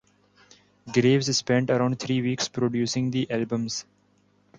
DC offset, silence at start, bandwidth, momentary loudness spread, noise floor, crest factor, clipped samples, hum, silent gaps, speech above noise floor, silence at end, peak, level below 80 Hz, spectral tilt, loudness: under 0.1%; 0.85 s; 9.2 kHz; 7 LU; -64 dBFS; 18 dB; under 0.1%; 50 Hz at -55 dBFS; none; 40 dB; 0.75 s; -8 dBFS; -62 dBFS; -5 dB/octave; -25 LUFS